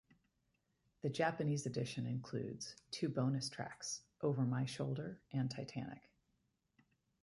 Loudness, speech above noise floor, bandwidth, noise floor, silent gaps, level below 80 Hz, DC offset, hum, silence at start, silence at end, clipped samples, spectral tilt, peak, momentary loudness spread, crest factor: -41 LUFS; 42 dB; 11.5 kHz; -83 dBFS; none; -76 dBFS; under 0.1%; none; 1.05 s; 1.25 s; under 0.1%; -5.5 dB/octave; -24 dBFS; 9 LU; 18 dB